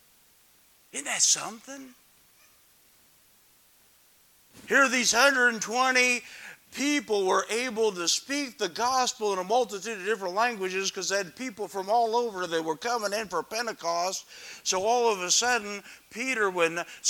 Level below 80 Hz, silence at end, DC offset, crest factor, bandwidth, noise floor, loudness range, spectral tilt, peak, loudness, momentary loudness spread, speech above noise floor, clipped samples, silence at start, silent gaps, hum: -72 dBFS; 0 s; under 0.1%; 22 dB; 19 kHz; -61 dBFS; 6 LU; -1 dB/octave; -6 dBFS; -26 LUFS; 14 LU; 33 dB; under 0.1%; 0.95 s; none; none